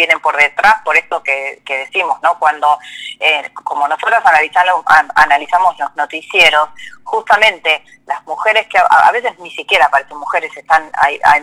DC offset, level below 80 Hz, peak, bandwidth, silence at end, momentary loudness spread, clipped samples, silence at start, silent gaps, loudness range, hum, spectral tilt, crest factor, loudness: under 0.1%; -52 dBFS; 0 dBFS; 16 kHz; 0 s; 12 LU; 0.1%; 0 s; none; 3 LU; none; -1 dB/octave; 12 dB; -12 LUFS